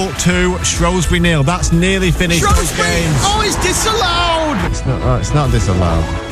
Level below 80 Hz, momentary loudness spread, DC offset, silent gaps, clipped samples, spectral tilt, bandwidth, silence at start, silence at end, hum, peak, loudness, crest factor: -20 dBFS; 3 LU; under 0.1%; none; under 0.1%; -4 dB/octave; 15 kHz; 0 s; 0 s; none; -2 dBFS; -14 LUFS; 12 dB